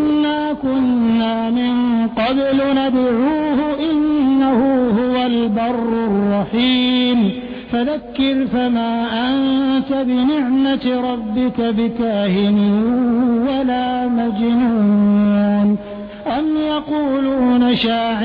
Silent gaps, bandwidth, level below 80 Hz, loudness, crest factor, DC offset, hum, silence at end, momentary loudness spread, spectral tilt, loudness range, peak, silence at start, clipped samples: none; 5 kHz; -46 dBFS; -16 LUFS; 10 dB; under 0.1%; none; 0 s; 5 LU; -9 dB/octave; 2 LU; -6 dBFS; 0 s; under 0.1%